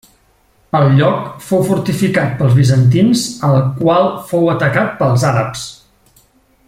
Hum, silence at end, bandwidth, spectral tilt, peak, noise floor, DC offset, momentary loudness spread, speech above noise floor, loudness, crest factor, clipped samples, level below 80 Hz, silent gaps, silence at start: none; 0.95 s; 15.5 kHz; -6.5 dB/octave; 0 dBFS; -54 dBFS; under 0.1%; 7 LU; 41 dB; -13 LUFS; 12 dB; under 0.1%; -46 dBFS; none; 0.75 s